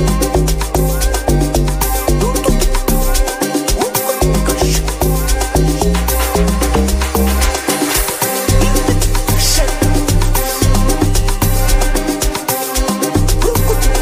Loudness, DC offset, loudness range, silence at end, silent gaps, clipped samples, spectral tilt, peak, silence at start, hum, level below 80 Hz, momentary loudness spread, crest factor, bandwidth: -14 LUFS; under 0.1%; 1 LU; 0 s; none; under 0.1%; -4.5 dB/octave; -2 dBFS; 0 s; none; -16 dBFS; 2 LU; 12 dB; 16 kHz